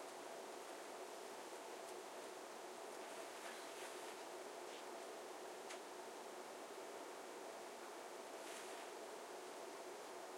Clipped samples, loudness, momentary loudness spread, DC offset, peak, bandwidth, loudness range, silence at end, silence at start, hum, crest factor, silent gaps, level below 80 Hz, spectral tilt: under 0.1%; -53 LUFS; 2 LU; under 0.1%; -36 dBFS; 16.5 kHz; 1 LU; 0 s; 0 s; none; 16 dB; none; under -90 dBFS; -1.5 dB/octave